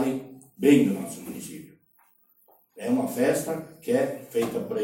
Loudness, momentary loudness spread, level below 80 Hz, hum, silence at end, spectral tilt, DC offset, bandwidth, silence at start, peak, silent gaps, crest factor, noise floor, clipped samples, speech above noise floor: -26 LUFS; 18 LU; -68 dBFS; none; 0 s; -5.5 dB/octave; under 0.1%; 16.5 kHz; 0 s; -6 dBFS; none; 20 dB; -63 dBFS; under 0.1%; 38 dB